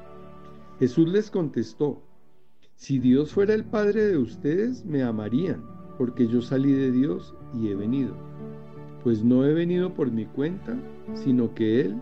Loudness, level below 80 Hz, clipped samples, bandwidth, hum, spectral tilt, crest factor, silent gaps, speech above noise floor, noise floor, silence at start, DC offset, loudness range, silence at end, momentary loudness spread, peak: -25 LUFS; -58 dBFS; under 0.1%; 7 kHz; none; -8.5 dB/octave; 16 dB; none; 40 dB; -64 dBFS; 0 s; 0.6%; 2 LU; 0 s; 14 LU; -10 dBFS